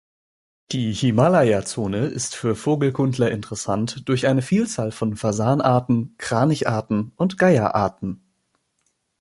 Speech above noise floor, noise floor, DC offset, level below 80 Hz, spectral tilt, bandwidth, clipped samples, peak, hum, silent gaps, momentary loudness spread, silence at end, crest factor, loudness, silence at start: 50 dB; -71 dBFS; under 0.1%; -52 dBFS; -6 dB/octave; 11.5 kHz; under 0.1%; -2 dBFS; none; none; 8 LU; 1.05 s; 20 dB; -21 LUFS; 0.7 s